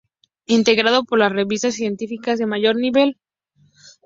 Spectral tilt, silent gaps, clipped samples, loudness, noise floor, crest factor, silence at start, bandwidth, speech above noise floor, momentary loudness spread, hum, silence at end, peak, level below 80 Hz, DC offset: -4 dB/octave; none; under 0.1%; -18 LUFS; -60 dBFS; 18 dB; 0.5 s; 7.8 kHz; 42 dB; 8 LU; none; 0.9 s; -2 dBFS; -62 dBFS; under 0.1%